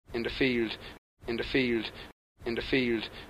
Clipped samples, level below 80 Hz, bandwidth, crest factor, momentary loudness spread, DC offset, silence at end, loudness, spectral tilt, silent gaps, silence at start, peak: under 0.1%; -50 dBFS; 14.5 kHz; 18 dB; 17 LU; under 0.1%; 0 s; -31 LUFS; -6 dB/octave; 0.98-1.17 s, 2.13-2.35 s; 0.1 s; -14 dBFS